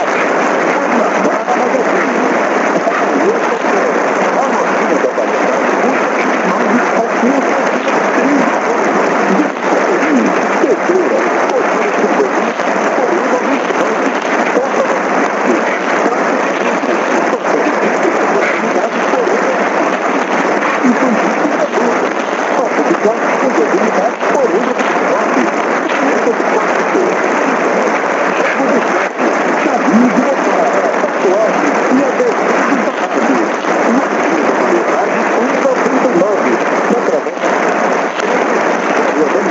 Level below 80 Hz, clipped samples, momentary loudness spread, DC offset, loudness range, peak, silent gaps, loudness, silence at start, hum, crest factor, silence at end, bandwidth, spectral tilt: -66 dBFS; under 0.1%; 2 LU; under 0.1%; 1 LU; 0 dBFS; none; -12 LUFS; 0 s; none; 12 dB; 0 s; 8 kHz; -4.5 dB/octave